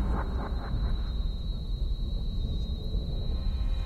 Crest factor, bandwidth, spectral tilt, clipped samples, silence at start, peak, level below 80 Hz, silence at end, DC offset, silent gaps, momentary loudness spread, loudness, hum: 10 dB; 4.8 kHz; -7.5 dB/octave; under 0.1%; 0 s; -18 dBFS; -30 dBFS; 0 s; under 0.1%; none; 2 LU; -34 LUFS; none